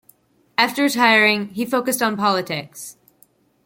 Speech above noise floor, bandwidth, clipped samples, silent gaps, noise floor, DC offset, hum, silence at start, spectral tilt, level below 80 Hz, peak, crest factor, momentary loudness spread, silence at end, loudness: 39 dB; 17 kHz; under 0.1%; none; -58 dBFS; under 0.1%; none; 0.6 s; -3 dB/octave; -68 dBFS; 0 dBFS; 20 dB; 17 LU; 0.75 s; -18 LUFS